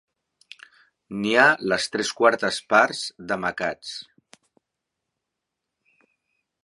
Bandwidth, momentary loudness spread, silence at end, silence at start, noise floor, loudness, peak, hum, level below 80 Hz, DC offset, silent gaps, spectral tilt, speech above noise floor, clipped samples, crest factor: 11.5 kHz; 17 LU; 2.65 s; 1.1 s; -83 dBFS; -21 LUFS; -2 dBFS; none; -66 dBFS; under 0.1%; none; -3 dB/octave; 61 dB; under 0.1%; 24 dB